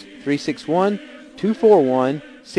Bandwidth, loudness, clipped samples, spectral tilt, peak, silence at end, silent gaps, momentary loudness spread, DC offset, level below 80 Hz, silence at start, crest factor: 10.5 kHz; -19 LUFS; under 0.1%; -6.5 dB/octave; -2 dBFS; 0 s; none; 15 LU; under 0.1%; -62 dBFS; 0.1 s; 16 dB